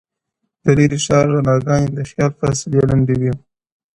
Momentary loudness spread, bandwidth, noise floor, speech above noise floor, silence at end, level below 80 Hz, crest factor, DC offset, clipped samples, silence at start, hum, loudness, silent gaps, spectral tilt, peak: 7 LU; 11 kHz; -75 dBFS; 60 dB; 0.6 s; -40 dBFS; 16 dB; under 0.1%; under 0.1%; 0.65 s; none; -16 LUFS; none; -6.5 dB/octave; 0 dBFS